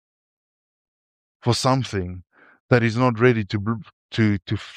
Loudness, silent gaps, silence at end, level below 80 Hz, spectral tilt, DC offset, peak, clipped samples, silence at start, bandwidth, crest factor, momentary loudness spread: -22 LUFS; 2.60-2.69 s, 3.93-4.09 s; 0 s; -54 dBFS; -6 dB/octave; under 0.1%; -2 dBFS; under 0.1%; 1.45 s; 11 kHz; 20 dB; 13 LU